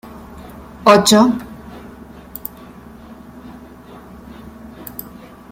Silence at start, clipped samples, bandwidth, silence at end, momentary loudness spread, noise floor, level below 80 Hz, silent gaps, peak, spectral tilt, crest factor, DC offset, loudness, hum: 0.35 s; under 0.1%; 16.5 kHz; 0.5 s; 27 LU; -39 dBFS; -46 dBFS; none; 0 dBFS; -4 dB/octave; 20 dB; under 0.1%; -12 LUFS; none